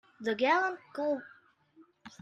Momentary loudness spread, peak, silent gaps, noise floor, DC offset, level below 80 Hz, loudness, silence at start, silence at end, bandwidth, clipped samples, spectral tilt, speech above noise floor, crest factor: 9 LU; -14 dBFS; none; -63 dBFS; under 0.1%; -82 dBFS; -31 LUFS; 0.2 s; 0.1 s; 9.6 kHz; under 0.1%; -4.5 dB/octave; 32 dB; 20 dB